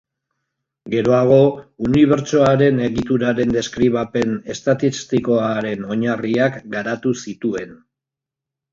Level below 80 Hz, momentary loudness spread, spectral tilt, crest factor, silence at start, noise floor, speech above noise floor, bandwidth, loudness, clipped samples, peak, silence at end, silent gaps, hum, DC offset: -50 dBFS; 10 LU; -6.5 dB/octave; 18 dB; 0.85 s; -86 dBFS; 68 dB; 7.6 kHz; -18 LUFS; under 0.1%; 0 dBFS; 0.95 s; none; none; under 0.1%